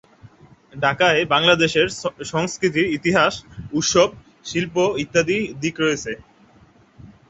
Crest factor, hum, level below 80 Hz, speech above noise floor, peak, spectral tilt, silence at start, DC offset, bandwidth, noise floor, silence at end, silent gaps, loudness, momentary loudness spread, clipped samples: 20 dB; none; -52 dBFS; 33 dB; -2 dBFS; -3.5 dB/octave; 0.25 s; under 0.1%; 8.2 kHz; -52 dBFS; 0.2 s; none; -19 LUFS; 11 LU; under 0.1%